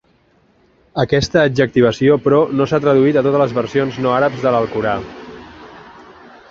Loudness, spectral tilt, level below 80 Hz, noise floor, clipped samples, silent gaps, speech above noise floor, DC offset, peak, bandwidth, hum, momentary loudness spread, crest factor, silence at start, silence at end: -15 LUFS; -6.5 dB/octave; -46 dBFS; -55 dBFS; under 0.1%; none; 41 dB; under 0.1%; -2 dBFS; 7.4 kHz; none; 12 LU; 14 dB; 0.95 s; 0.7 s